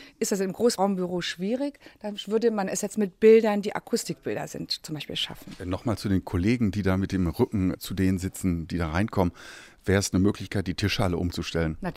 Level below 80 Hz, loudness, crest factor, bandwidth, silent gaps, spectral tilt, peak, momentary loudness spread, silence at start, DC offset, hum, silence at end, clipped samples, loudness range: -46 dBFS; -26 LUFS; 18 dB; 16 kHz; none; -5.5 dB/octave; -8 dBFS; 9 LU; 0 s; under 0.1%; none; 0 s; under 0.1%; 3 LU